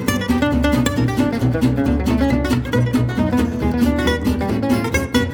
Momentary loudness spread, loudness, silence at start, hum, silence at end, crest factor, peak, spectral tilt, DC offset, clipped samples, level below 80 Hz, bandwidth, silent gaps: 2 LU; -18 LUFS; 0 s; none; 0 s; 16 dB; -2 dBFS; -6.5 dB/octave; under 0.1%; under 0.1%; -30 dBFS; over 20 kHz; none